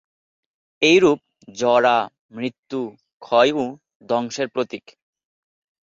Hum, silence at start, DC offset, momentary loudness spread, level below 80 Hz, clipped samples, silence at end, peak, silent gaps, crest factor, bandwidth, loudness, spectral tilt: none; 0.8 s; under 0.1%; 14 LU; -64 dBFS; under 0.1%; 1.1 s; -4 dBFS; 2.19-2.29 s, 2.59-2.63 s, 3.13-3.20 s, 3.95-4.00 s; 18 dB; 7.8 kHz; -20 LUFS; -4 dB/octave